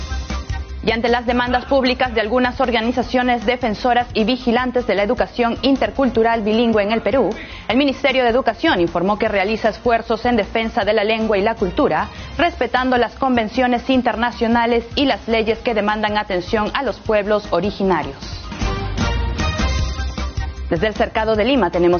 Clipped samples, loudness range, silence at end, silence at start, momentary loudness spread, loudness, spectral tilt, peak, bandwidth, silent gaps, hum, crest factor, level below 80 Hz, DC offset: under 0.1%; 3 LU; 0 s; 0 s; 6 LU; -18 LUFS; -3.5 dB/octave; -4 dBFS; 6.8 kHz; none; none; 14 dB; -32 dBFS; under 0.1%